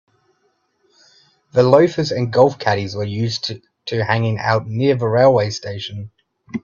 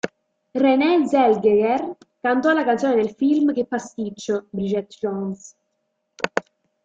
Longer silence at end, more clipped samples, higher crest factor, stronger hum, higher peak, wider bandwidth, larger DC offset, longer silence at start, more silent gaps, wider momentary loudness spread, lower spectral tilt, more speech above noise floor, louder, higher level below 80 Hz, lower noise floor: second, 0.05 s vs 0.45 s; neither; about the same, 18 dB vs 18 dB; neither; about the same, 0 dBFS vs -2 dBFS; about the same, 7.4 kHz vs 7.8 kHz; neither; first, 1.55 s vs 0.05 s; neither; about the same, 15 LU vs 13 LU; about the same, -6.5 dB/octave vs -6 dB/octave; second, 48 dB vs 54 dB; first, -17 LUFS vs -21 LUFS; first, -56 dBFS vs -64 dBFS; second, -65 dBFS vs -74 dBFS